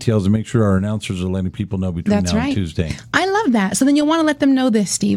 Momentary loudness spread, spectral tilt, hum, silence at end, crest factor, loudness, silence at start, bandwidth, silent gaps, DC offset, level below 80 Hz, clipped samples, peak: 8 LU; -5.5 dB/octave; none; 0 s; 16 dB; -18 LUFS; 0 s; 15 kHz; none; under 0.1%; -40 dBFS; under 0.1%; 0 dBFS